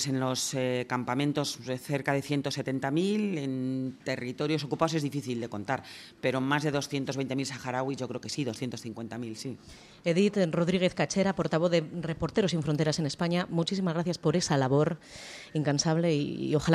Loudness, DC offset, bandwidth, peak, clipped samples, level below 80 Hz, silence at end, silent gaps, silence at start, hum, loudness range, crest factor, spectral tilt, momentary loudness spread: -30 LUFS; under 0.1%; 14.5 kHz; -10 dBFS; under 0.1%; -62 dBFS; 0 s; none; 0 s; none; 4 LU; 20 dB; -5.5 dB/octave; 9 LU